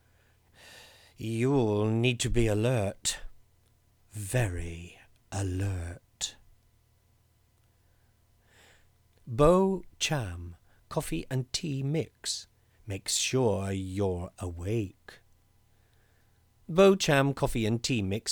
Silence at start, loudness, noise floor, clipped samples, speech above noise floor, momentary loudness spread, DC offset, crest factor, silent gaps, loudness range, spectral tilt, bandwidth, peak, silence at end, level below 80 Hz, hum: 0.65 s; -29 LUFS; -66 dBFS; under 0.1%; 38 dB; 17 LU; under 0.1%; 22 dB; none; 10 LU; -5 dB/octave; over 20 kHz; -8 dBFS; 0 s; -46 dBFS; none